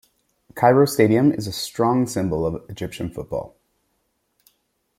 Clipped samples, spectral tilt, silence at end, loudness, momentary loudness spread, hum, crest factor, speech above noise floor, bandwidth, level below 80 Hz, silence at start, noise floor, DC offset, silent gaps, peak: under 0.1%; -6 dB/octave; 1.5 s; -21 LUFS; 15 LU; none; 20 dB; 51 dB; 16.5 kHz; -52 dBFS; 0.55 s; -71 dBFS; under 0.1%; none; -2 dBFS